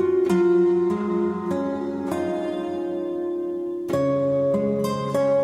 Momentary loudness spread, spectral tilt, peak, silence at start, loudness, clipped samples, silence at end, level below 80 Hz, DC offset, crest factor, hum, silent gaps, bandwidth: 9 LU; -7.5 dB/octave; -10 dBFS; 0 s; -23 LUFS; under 0.1%; 0 s; -60 dBFS; under 0.1%; 12 dB; none; none; 13.5 kHz